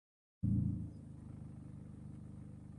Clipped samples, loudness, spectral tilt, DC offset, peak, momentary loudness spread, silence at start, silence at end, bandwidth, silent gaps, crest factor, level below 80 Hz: under 0.1%; -43 LUFS; -10.5 dB/octave; under 0.1%; -26 dBFS; 16 LU; 0.45 s; 0 s; 10 kHz; none; 18 dB; -52 dBFS